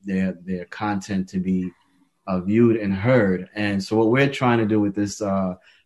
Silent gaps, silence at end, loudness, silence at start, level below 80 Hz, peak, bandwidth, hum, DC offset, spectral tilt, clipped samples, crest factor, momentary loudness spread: none; 0.3 s; -22 LUFS; 0.05 s; -50 dBFS; -4 dBFS; 12 kHz; none; under 0.1%; -7 dB/octave; under 0.1%; 18 dB; 10 LU